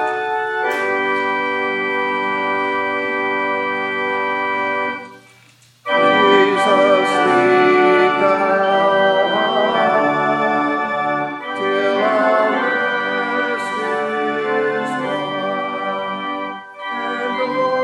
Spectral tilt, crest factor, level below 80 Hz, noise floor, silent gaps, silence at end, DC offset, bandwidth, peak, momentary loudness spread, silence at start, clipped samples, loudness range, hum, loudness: -5 dB/octave; 16 dB; -70 dBFS; -50 dBFS; none; 0 s; under 0.1%; 11.5 kHz; 0 dBFS; 9 LU; 0 s; under 0.1%; 7 LU; none; -17 LUFS